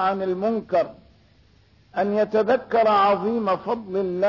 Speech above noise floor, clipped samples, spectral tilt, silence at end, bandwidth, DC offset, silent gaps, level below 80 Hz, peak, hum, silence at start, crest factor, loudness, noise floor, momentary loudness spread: 35 dB; under 0.1%; -7.5 dB/octave; 0 s; 6 kHz; under 0.1%; none; -60 dBFS; -10 dBFS; none; 0 s; 12 dB; -22 LUFS; -56 dBFS; 8 LU